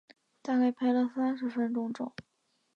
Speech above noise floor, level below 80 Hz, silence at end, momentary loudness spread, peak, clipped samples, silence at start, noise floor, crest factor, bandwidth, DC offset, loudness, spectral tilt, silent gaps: 46 dB; -78 dBFS; 0.55 s; 13 LU; -18 dBFS; under 0.1%; 0.45 s; -76 dBFS; 14 dB; 6.8 kHz; under 0.1%; -31 LUFS; -6.5 dB/octave; none